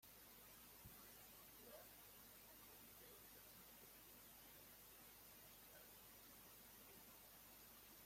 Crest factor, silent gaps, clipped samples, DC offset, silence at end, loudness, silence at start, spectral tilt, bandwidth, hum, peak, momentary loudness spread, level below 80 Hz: 16 dB; none; under 0.1%; under 0.1%; 0 s; -62 LUFS; 0 s; -2 dB/octave; 16.5 kHz; none; -48 dBFS; 1 LU; -80 dBFS